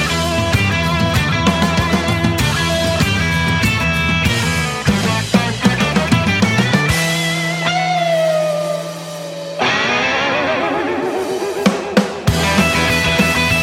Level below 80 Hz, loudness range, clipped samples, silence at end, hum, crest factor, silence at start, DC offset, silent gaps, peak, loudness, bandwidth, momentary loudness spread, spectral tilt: -32 dBFS; 2 LU; under 0.1%; 0 s; none; 16 dB; 0 s; under 0.1%; none; 0 dBFS; -15 LUFS; 16.5 kHz; 5 LU; -4.5 dB/octave